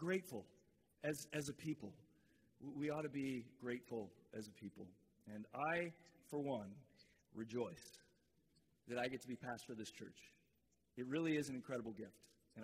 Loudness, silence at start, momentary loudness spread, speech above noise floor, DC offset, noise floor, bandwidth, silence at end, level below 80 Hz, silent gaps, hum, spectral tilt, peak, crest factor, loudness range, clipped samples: -47 LUFS; 0 s; 18 LU; 35 dB; under 0.1%; -82 dBFS; 15.5 kHz; 0 s; -82 dBFS; none; none; -5.5 dB/octave; -28 dBFS; 20 dB; 3 LU; under 0.1%